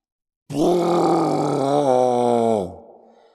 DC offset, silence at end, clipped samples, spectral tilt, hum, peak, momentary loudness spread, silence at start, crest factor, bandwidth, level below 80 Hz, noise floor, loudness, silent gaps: under 0.1%; 0.55 s; under 0.1%; -6.5 dB/octave; none; -4 dBFS; 6 LU; 0.5 s; 16 dB; 13.5 kHz; -58 dBFS; -48 dBFS; -19 LUFS; none